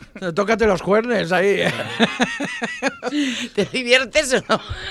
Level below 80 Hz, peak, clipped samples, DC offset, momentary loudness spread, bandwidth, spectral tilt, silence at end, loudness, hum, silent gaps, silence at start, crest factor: -44 dBFS; 0 dBFS; under 0.1%; under 0.1%; 7 LU; 15.5 kHz; -4 dB/octave; 0 s; -19 LUFS; none; none; 0 s; 20 dB